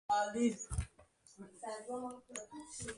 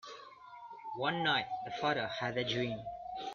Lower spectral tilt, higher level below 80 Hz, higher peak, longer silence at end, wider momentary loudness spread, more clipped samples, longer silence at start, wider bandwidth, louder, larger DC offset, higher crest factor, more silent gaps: about the same, -4.5 dB/octave vs -5 dB/octave; first, -54 dBFS vs -68 dBFS; second, -22 dBFS vs -18 dBFS; about the same, 0 s vs 0 s; second, 15 LU vs 19 LU; neither; about the same, 0.1 s vs 0.05 s; first, 11.5 kHz vs 7.4 kHz; second, -40 LUFS vs -35 LUFS; neither; about the same, 18 dB vs 20 dB; neither